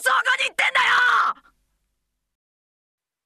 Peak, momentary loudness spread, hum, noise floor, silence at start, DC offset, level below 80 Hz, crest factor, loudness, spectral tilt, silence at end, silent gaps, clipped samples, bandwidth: -8 dBFS; 7 LU; none; -76 dBFS; 0 s; under 0.1%; -70 dBFS; 16 dB; -18 LUFS; 1.5 dB/octave; 1.9 s; none; under 0.1%; 13.5 kHz